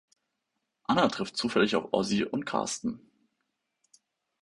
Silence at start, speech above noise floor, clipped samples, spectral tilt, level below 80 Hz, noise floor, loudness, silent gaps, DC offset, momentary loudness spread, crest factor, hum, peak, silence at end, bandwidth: 0.9 s; 54 dB; under 0.1%; -4 dB/octave; -64 dBFS; -82 dBFS; -29 LUFS; none; under 0.1%; 10 LU; 22 dB; none; -10 dBFS; 1.45 s; 11.5 kHz